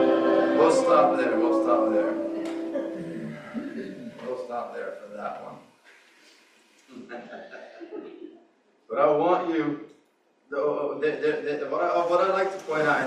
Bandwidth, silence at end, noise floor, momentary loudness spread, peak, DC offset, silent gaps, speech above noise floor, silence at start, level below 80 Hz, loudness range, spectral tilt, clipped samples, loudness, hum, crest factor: 10.5 kHz; 0 s; -65 dBFS; 20 LU; -6 dBFS; under 0.1%; none; 40 dB; 0 s; -74 dBFS; 18 LU; -5.5 dB/octave; under 0.1%; -25 LUFS; none; 20 dB